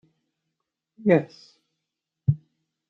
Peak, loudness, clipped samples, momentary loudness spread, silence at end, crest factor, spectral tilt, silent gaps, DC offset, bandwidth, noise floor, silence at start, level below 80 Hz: -6 dBFS; -25 LUFS; under 0.1%; 11 LU; 0.55 s; 22 dB; -9.5 dB/octave; none; under 0.1%; 7 kHz; -84 dBFS; 1.05 s; -62 dBFS